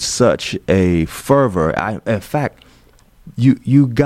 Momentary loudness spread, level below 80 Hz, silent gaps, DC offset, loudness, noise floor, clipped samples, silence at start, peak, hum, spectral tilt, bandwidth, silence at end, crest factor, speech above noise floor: 8 LU; -40 dBFS; none; under 0.1%; -16 LUFS; -49 dBFS; under 0.1%; 0 s; -2 dBFS; none; -6 dB/octave; 15.5 kHz; 0 s; 14 dB; 34 dB